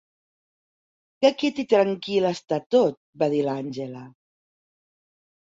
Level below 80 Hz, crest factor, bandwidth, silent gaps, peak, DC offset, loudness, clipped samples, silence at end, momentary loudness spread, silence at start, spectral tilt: -70 dBFS; 22 dB; 7.8 kHz; 2.66-2.70 s, 2.97-3.13 s; -4 dBFS; under 0.1%; -23 LUFS; under 0.1%; 1.3 s; 12 LU; 1.2 s; -6 dB/octave